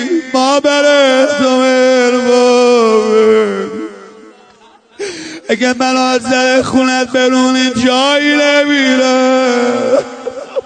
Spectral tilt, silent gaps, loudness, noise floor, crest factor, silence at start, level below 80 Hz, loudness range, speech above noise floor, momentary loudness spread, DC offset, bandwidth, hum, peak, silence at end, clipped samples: -3 dB/octave; none; -10 LUFS; -44 dBFS; 10 dB; 0 s; -54 dBFS; 5 LU; 33 dB; 13 LU; under 0.1%; 9.4 kHz; none; 0 dBFS; 0.05 s; under 0.1%